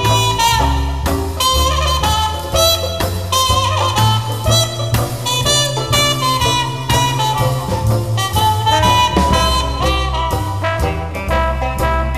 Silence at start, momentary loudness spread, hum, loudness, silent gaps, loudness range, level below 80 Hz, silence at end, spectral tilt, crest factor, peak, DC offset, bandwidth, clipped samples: 0 s; 6 LU; none; -15 LUFS; none; 1 LU; -24 dBFS; 0 s; -3.5 dB/octave; 14 dB; 0 dBFS; 1%; 15.5 kHz; under 0.1%